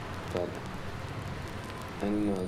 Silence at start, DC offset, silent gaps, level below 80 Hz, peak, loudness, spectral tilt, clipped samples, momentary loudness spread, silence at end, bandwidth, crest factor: 0 s; under 0.1%; none; -50 dBFS; -16 dBFS; -36 LUFS; -6.5 dB/octave; under 0.1%; 9 LU; 0 s; 16 kHz; 18 dB